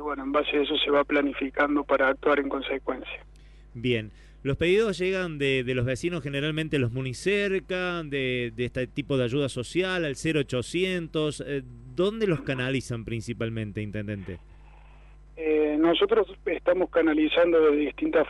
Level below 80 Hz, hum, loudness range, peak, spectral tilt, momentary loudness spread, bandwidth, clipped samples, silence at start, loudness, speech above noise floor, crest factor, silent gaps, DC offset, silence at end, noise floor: -50 dBFS; none; 5 LU; -10 dBFS; -6 dB/octave; 10 LU; 11.5 kHz; under 0.1%; 0 s; -26 LUFS; 23 dB; 16 dB; none; under 0.1%; 0 s; -49 dBFS